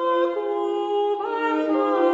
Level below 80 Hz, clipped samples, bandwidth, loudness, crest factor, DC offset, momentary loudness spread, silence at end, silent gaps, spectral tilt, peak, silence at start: -74 dBFS; under 0.1%; 7.8 kHz; -23 LUFS; 14 dB; under 0.1%; 4 LU; 0 s; none; -4.5 dB/octave; -8 dBFS; 0 s